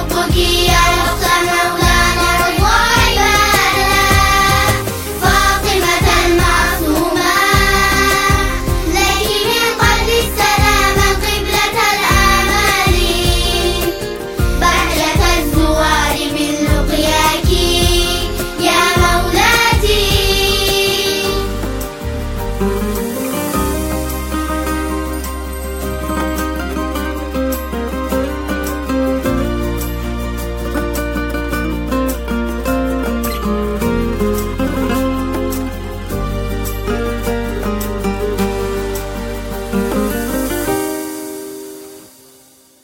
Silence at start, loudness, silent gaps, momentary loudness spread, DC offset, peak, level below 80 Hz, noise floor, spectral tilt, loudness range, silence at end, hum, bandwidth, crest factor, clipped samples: 0 s; -14 LUFS; none; 11 LU; under 0.1%; 0 dBFS; -22 dBFS; -46 dBFS; -3.5 dB/octave; 8 LU; 0.75 s; none; 17 kHz; 14 dB; under 0.1%